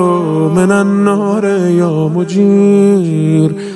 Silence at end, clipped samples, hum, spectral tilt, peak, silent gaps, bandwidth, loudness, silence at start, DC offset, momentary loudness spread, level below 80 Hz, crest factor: 0 s; under 0.1%; none; -8 dB/octave; 0 dBFS; none; 11.5 kHz; -11 LUFS; 0 s; under 0.1%; 4 LU; -54 dBFS; 10 dB